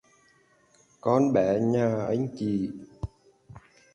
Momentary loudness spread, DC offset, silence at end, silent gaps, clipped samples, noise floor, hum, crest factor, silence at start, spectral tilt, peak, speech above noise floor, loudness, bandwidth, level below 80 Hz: 17 LU; under 0.1%; 0.35 s; none; under 0.1%; -63 dBFS; none; 18 dB; 1.05 s; -8.5 dB/octave; -10 dBFS; 38 dB; -26 LUFS; 10.5 kHz; -52 dBFS